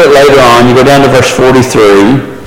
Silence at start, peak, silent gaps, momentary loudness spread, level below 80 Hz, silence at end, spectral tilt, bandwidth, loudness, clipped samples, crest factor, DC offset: 0 s; 0 dBFS; none; 3 LU; -30 dBFS; 0 s; -5 dB/octave; 17 kHz; -4 LUFS; 1%; 4 dB; under 0.1%